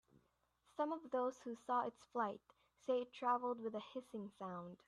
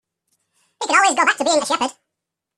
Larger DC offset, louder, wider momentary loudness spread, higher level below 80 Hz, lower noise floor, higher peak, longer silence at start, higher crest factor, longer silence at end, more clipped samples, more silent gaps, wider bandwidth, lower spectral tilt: neither; second, -43 LUFS vs -17 LUFS; about the same, 11 LU vs 10 LU; second, -86 dBFS vs -70 dBFS; about the same, -80 dBFS vs -82 dBFS; second, -26 dBFS vs -2 dBFS; about the same, 0.8 s vs 0.8 s; about the same, 18 dB vs 18 dB; second, 0.15 s vs 0.65 s; neither; neither; second, 11 kHz vs 14.5 kHz; first, -6 dB/octave vs 0 dB/octave